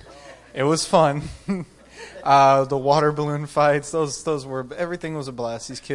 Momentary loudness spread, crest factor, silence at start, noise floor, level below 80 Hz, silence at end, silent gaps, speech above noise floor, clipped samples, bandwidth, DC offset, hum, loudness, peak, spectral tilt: 14 LU; 20 dB; 0.05 s; -44 dBFS; -52 dBFS; 0 s; none; 23 dB; under 0.1%; 11.5 kHz; under 0.1%; none; -21 LUFS; -2 dBFS; -5 dB/octave